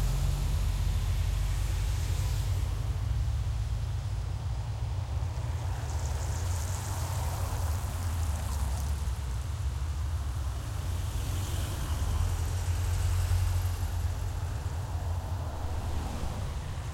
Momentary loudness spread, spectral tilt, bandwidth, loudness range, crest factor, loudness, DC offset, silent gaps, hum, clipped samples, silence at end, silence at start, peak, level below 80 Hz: 4 LU; -5 dB/octave; 16.5 kHz; 2 LU; 12 dB; -33 LUFS; under 0.1%; none; none; under 0.1%; 0 s; 0 s; -18 dBFS; -34 dBFS